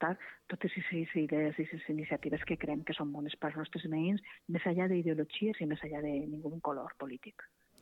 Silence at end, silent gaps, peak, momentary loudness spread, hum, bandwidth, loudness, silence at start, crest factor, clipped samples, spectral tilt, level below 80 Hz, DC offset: 0.35 s; none; -20 dBFS; 10 LU; none; 4.2 kHz; -37 LUFS; 0 s; 16 dB; under 0.1%; -8.5 dB/octave; -66 dBFS; under 0.1%